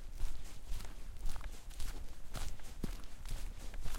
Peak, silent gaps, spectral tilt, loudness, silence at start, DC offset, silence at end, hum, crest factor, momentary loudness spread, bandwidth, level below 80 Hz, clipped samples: -22 dBFS; none; -4 dB/octave; -49 LUFS; 0 s; under 0.1%; 0 s; none; 14 dB; 4 LU; 15.5 kHz; -42 dBFS; under 0.1%